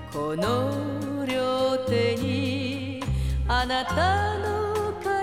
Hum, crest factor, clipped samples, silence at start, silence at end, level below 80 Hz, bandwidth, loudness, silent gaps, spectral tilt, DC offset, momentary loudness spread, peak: none; 14 dB; under 0.1%; 0 s; 0 s; -36 dBFS; 16 kHz; -26 LUFS; none; -6 dB/octave; 0.2%; 6 LU; -10 dBFS